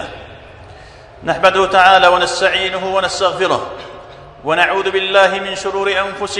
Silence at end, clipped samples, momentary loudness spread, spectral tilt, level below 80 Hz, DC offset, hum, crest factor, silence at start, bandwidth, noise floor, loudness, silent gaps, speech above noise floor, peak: 0 s; 0.2%; 18 LU; -2.5 dB/octave; -46 dBFS; under 0.1%; none; 16 dB; 0 s; 12 kHz; -38 dBFS; -13 LUFS; none; 24 dB; 0 dBFS